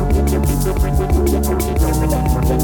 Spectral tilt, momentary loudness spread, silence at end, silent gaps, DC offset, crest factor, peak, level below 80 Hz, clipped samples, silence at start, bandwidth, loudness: -6.5 dB/octave; 2 LU; 0 s; none; under 0.1%; 12 dB; -4 dBFS; -18 dBFS; under 0.1%; 0 s; 20 kHz; -17 LUFS